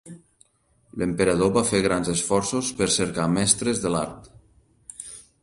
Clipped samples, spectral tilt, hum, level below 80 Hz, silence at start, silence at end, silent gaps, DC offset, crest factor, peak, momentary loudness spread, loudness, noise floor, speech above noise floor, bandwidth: under 0.1%; -4 dB/octave; none; -50 dBFS; 0.05 s; 0.2 s; none; under 0.1%; 22 dB; -2 dBFS; 18 LU; -23 LUFS; -63 dBFS; 40 dB; 11.5 kHz